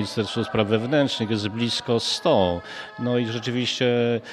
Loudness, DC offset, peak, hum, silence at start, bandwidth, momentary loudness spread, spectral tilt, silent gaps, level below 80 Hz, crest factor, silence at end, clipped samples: -23 LUFS; under 0.1%; -4 dBFS; none; 0 s; 13.5 kHz; 5 LU; -5 dB/octave; none; -56 dBFS; 20 dB; 0 s; under 0.1%